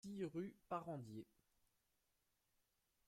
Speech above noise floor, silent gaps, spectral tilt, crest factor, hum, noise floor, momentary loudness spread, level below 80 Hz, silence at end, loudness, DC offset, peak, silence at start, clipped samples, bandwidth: 36 dB; none; -7.5 dB/octave; 20 dB; none; -86 dBFS; 10 LU; -84 dBFS; 1.85 s; -51 LUFS; under 0.1%; -32 dBFS; 0.05 s; under 0.1%; 16 kHz